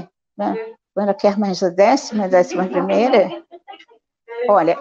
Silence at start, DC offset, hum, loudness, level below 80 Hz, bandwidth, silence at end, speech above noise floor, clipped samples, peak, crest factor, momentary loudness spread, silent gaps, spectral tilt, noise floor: 0 s; under 0.1%; none; -18 LUFS; -66 dBFS; 7.8 kHz; 0 s; 35 dB; under 0.1%; -2 dBFS; 16 dB; 12 LU; none; -5.5 dB/octave; -51 dBFS